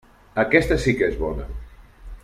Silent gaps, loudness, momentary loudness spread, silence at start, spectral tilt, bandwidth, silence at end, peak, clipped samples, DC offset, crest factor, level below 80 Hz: none; -21 LUFS; 17 LU; 0.35 s; -6 dB/octave; 14.5 kHz; 0.05 s; -2 dBFS; under 0.1%; under 0.1%; 22 dB; -34 dBFS